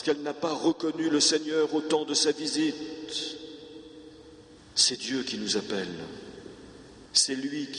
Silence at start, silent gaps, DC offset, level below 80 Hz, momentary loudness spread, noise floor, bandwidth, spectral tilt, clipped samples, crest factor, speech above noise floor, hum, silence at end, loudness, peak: 0 s; none; under 0.1%; -66 dBFS; 22 LU; -51 dBFS; 11.5 kHz; -2 dB/octave; under 0.1%; 22 dB; 23 dB; none; 0 s; -27 LUFS; -8 dBFS